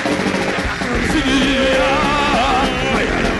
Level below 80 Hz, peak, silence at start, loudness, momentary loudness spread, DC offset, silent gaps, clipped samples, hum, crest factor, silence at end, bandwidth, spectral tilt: -28 dBFS; -6 dBFS; 0 s; -16 LUFS; 4 LU; under 0.1%; none; under 0.1%; none; 10 dB; 0 s; 11.5 kHz; -4.5 dB/octave